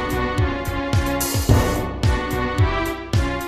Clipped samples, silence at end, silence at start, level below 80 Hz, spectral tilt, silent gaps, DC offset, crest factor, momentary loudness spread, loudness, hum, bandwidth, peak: under 0.1%; 0 s; 0 s; -26 dBFS; -5.5 dB/octave; none; under 0.1%; 16 dB; 5 LU; -21 LUFS; none; 15.5 kHz; -4 dBFS